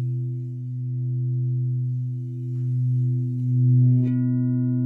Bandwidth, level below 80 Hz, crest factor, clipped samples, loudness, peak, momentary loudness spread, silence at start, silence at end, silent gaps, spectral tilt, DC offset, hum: 2 kHz; -72 dBFS; 12 dB; under 0.1%; -24 LUFS; -10 dBFS; 11 LU; 0 s; 0 s; none; -13 dB/octave; under 0.1%; none